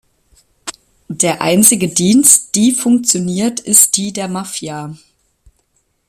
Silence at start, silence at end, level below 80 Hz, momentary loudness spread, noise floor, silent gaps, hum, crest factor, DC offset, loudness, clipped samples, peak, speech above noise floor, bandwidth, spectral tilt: 0.65 s; 1.15 s; -54 dBFS; 21 LU; -62 dBFS; none; none; 14 dB; under 0.1%; -11 LUFS; 0.2%; 0 dBFS; 49 dB; over 20 kHz; -3 dB/octave